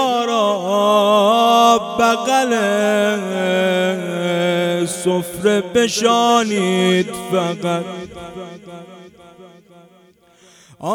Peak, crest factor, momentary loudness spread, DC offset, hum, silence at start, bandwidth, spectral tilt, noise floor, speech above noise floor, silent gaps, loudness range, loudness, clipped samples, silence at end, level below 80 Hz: -2 dBFS; 16 dB; 17 LU; under 0.1%; none; 0 s; 18.5 kHz; -4 dB/octave; -51 dBFS; 34 dB; none; 11 LU; -16 LUFS; under 0.1%; 0 s; -58 dBFS